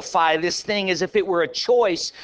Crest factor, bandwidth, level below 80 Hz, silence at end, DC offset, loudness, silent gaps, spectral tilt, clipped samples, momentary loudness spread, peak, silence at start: 16 dB; 8 kHz; -60 dBFS; 0 s; under 0.1%; -21 LUFS; none; -3 dB/octave; under 0.1%; 3 LU; -6 dBFS; 0 s